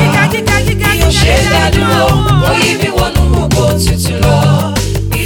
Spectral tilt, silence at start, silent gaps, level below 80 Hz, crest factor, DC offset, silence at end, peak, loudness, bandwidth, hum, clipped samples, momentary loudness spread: -5 dB/octave; 0 s; none; -18 dBFS; 10 dB; under 0.1%; 0 s; 0 dBFS; -10 LUFS; 19 kHz; none; under 0.1%; 3 LU